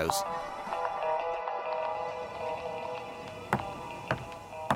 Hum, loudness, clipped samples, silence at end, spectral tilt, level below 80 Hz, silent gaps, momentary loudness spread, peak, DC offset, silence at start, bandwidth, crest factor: none; -35 LUFS; under 0.1%; 0 s; -4 dB/octave; -60 dBFS; none; 9 LU; -12 dBFS; under 0.1%; 0 s; 16 kHz; 22 dB